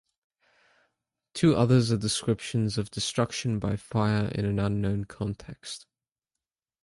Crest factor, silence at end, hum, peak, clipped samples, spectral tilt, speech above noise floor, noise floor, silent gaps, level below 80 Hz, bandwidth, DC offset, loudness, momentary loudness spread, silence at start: 20 dB; 1.05 s; none; -10 dBFS; under 0.1%; -6 dB/octave; 63 dB; -90 dBFS; none; -52 dBFS; 11.5 kHz; under 0.1%; -27 LUFS; 17 LU; 1.35 s